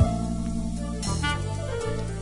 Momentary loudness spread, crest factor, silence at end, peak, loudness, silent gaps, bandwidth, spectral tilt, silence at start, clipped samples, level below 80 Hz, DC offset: 4 LU; 18 dB; 0 s; -8 dBFS; -29 LUFS; none; 11 kHz; -5.5 dB/octave; 0 s; under 0.1%; -34 dBFS; under 0.1%